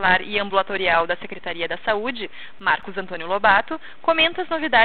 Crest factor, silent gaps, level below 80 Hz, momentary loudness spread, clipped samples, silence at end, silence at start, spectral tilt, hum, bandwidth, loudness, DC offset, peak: 20 dB; none; -52 dBFS; 13 LU; under 0.1%; 0 s; 0 s; -7.5 dB/octave; none; 4.7 kHz; -21 LUFS; 2%; -2 dBFS